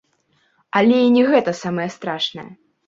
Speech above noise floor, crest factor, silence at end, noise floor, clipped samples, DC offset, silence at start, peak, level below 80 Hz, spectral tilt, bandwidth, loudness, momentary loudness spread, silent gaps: 46 dB; 18 dB; 0.35 s; -63 dBFS; under 0.1%; under 0.1%; 0.75 s; -2 dBFS; -64 dBFS; -5.5 dB/octave; 7.6 kHz; -18 LUFS; 11 LU; none